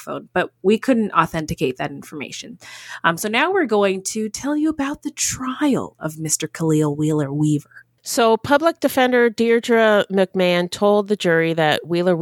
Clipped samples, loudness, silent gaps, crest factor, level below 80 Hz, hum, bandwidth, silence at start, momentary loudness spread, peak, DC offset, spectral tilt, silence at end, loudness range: under 0.1%; -19 LUFS; none; 18 dB; -54 dBFS; none; 18 kHz; 0 s; 12 LU; 0 dBFS; under 0.1%; -4.5 dB/octave; 0 s; 4 LU